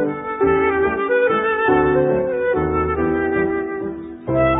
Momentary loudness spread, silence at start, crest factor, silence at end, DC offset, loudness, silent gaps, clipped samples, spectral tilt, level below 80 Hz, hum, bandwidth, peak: 7 LU; 0 s; 14 dB; 0 s; under 0.1%; -18 LUFS; none; under 0.1%; -12 dB/octave; -38 dBFS; none; 3.8 kHz; -4 dBFS